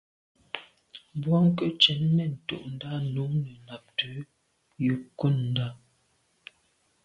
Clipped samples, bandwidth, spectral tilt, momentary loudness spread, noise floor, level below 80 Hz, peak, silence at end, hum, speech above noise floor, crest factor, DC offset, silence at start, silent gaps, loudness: under 0.1%; 7.8 kHz; -7 dB/octave; 18 LU; -70 dBFS; -64 dBFS; -6 dBFS; 1.3 s; none; 43 dB; 24 dB; under 0.1%; 0.55 s; none; -27 LUFS